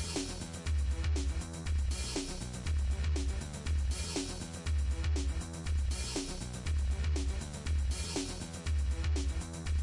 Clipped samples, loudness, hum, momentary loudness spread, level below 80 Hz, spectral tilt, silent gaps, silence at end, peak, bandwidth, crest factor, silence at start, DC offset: under 0.1%; -36 LUFS; none; 6 LU; -36 dBFS; -4.5 dB/octave; none; 0 s; -24 dBFS; 11.5 kHz; 10 dB; 0 s; under 0.1%